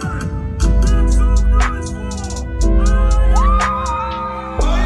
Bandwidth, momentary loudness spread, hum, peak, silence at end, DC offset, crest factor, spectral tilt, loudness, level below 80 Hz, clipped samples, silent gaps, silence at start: 10.5 kHz; 9 LU; none; -2 dBFS; 0 s; under 0.1%; 12 dB; -6 dB/octave; -17 LUFS; -14 dBFS; under 0.1%; none; 0 s